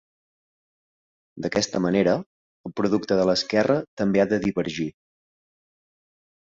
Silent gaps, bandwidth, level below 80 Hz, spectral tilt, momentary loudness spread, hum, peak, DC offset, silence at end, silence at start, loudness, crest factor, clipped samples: 2.26-2.64 s, 3.88-3.97 s; 7.8 kHz; -58 dBFS; -5.5 dB/octave; 11 LU; none; -6 dBFS; under 0.1%; 1.6 s; 1.35 s; -23 LUFS; 18 dB; under 0.1%